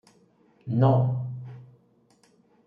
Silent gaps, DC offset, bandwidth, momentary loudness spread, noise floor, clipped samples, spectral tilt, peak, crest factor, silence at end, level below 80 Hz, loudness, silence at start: none; under 0.1%; 4.5 kHz; 23 LU; -62 dBFS; under 0.1%; -10.5 dB/octave; -10 dBFS; 18 dB; 1.05 s; -68 dBFS; -25 LUFS; 0.65 s